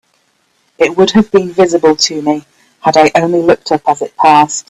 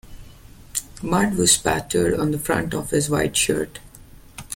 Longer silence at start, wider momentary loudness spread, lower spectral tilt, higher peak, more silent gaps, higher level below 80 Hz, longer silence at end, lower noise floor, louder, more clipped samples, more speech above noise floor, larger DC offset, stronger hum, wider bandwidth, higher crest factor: first, 0.8 s vs 0.05 s; second, 7 LU vs 14 LU; about the same, -4 dB/octave vs -3.5 dB/octave; about the same, 0 dBFS vs -2 dBFS; neither; about the same, -48 dBFS vs -44 dBFS; about the same, 0.1 s vs 0 s; first, -57 dBFS vs -45 dBFS; first, -11 LUFS vs -21 LUFS; neither; first, 48 dB vs 24 dB; neither; neither; second, 12.5 kHz vs 17 kHz; second, 12 dB vs 20 dB